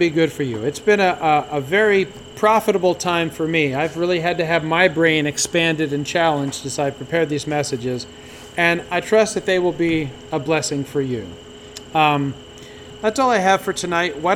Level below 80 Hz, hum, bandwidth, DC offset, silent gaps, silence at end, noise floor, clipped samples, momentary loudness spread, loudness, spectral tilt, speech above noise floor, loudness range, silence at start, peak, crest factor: -52 dBFS; none; 18 kHz; under 0.1%; none; 0 s; -38 dBFS; under 0.1%; 11 LU; -19 LUFS; -4.5 dB/octave; 19 dB; 3 LU; 0 s; -2 dBFS; 18 dB